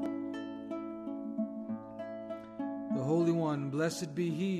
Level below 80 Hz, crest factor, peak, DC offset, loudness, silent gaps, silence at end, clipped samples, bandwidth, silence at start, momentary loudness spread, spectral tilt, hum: -74 dBFS; 16 dB; -20 dBFS; under 0.1%; -36 LUFS; none; 0 s; under 0.1%; 13.5 kHz; 0 s; 12 LU; -6.5 dB/octave; none